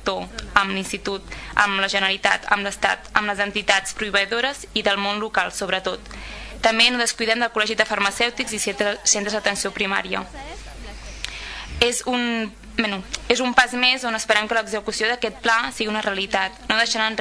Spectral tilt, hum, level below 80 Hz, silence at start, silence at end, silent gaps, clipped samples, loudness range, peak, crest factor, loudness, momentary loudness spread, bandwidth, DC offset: -1.5 dB/octave; none; -44 dBFS; 0 s; 0 s; none; under 0.1%; 4 LU; 0 dBFS; 22 dB; -21 LUFS; 12 LU; 11 kHz; under 0.1%